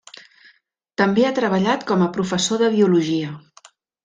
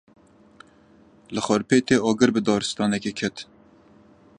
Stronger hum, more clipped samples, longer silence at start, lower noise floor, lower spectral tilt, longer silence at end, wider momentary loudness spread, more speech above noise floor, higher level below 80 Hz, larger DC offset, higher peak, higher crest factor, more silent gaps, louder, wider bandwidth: neither; neither; second, 1 s vs 1.3 s; first, -59 dBFS vs -54 dBFS; about the same, -5 dB/octave vs -4.5 dB/octave; second, 0.65 s vs 0.95 s; about the same, 10 LU vs 12 LU; first, 41 dB vs 32 dB; about the same, -62 dBFS vs -60 dBFS; neither; about the same, -4 dBFS vs -4 dBFS; about the same, 16 dB vs 20 dB; neither; first, -19 LUFS vs -22 LUFS; second, 9.4 kHz vs 10.5 kHz